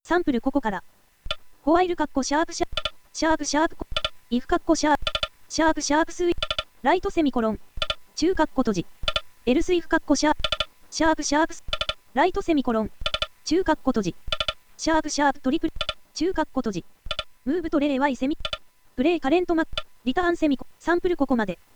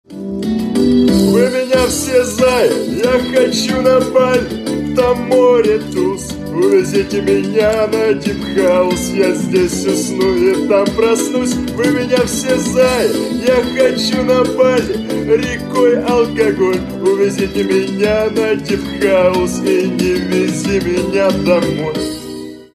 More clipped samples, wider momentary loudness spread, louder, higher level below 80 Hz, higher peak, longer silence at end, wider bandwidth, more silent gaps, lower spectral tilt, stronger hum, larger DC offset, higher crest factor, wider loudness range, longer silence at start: neither; about the same, 8 LU vs 6 LU; second, -25 LUFS vs -14 LUFS; about the same, -40 dBFS vs -38 dBFS; second, -6 dBFS vs -2 dBFS; about the same, 0.2 s vs 0.1 s; first, over 20 kHz vs 13.5 kHz; neither; second, -3.5 dB/octave vs -5 dB/octave; neither; neither; first, 18 dB vs 12 dB; about the same, 2 LU vs 2 LU; about the same, 0.05 s vs 0.1 s